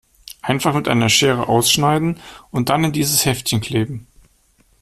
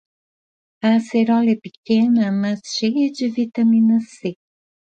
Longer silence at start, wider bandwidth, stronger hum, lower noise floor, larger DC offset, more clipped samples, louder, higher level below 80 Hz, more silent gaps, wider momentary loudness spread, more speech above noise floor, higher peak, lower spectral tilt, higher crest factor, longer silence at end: second, 0.3 s vs 0.85 s; first, 15.5 kHz vs 8.8 kHz; neither; second, -57 dBFS vs under -90 dBFS; neither; neither; about the same, -17 LUFS vs -18 LUFS; first, -48 dBFS vs -68 dBFS; second, none vs 1.77-1.83 s; first, 13 LU vs 8 LU; second, 40 dB vs over 72 dB; first, -2 dBFS vs -6 dBFS; second, -4 dB/octave vs -6 dB/octave; about the same, 16 dB vs 14 dB; first, 0.8 s vs 0.55 s